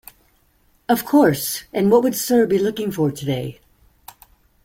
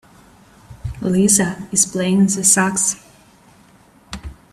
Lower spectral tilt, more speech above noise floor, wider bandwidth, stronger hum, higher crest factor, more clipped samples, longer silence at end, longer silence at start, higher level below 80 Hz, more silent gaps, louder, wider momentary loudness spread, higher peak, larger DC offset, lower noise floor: first, -5.5 dB/octave vs -3.5 dB/octave; first, 42 dB vs 33 dB; first, 16.5 kHz vs 14 kHz; neither; about the same, 16 dB vs 18 dB; neither; first, 1.1 s vs 0.2 s; first, 0.9 s vs 0.7 s; second, -54 dBFS vs -42 dBFS; neither; second, -19 LUFS vs -15 LUFS; second, 10 LU vs 21 LU; second, -4 dBFS vs 0 dBFS; neither; first, -60 dBFS vs -50 dBFS